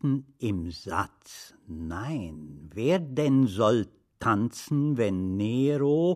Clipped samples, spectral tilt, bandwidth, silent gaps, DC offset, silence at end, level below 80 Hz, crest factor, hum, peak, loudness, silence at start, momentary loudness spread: under 0.1%; -7 dB/octave; 14 kHz; none; under 0.1%; 0 s; -54 dBFS; 16 dB; none; -12 dBFS; -27 LUFS; 0.05 s; 17 LU